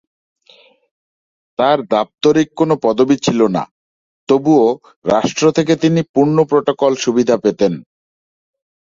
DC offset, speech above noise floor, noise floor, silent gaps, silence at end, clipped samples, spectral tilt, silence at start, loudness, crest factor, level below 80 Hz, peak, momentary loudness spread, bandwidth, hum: under 0.1%; 35 dB; -49 dBFS; 3.71-4.27 s, 4.96-5.02 s, 6.09-6.14 s; 1 s; under 0.1%; -6 dB/octave; 1.6 s; -15 LUFS; 14 dB; -56 dBFS; 0 dBFS; 5 LU; 7.6 kHz; none